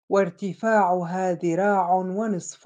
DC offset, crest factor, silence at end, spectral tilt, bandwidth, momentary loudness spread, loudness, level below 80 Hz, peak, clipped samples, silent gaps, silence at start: under 0.1%; 14 dB; 0.1 s; -6.5 dB/octave; 9.6 kHz; 7 LU; -23 LUFS; -76 dBFS; -10 dBFS; under 0.1%; none; 0.1 s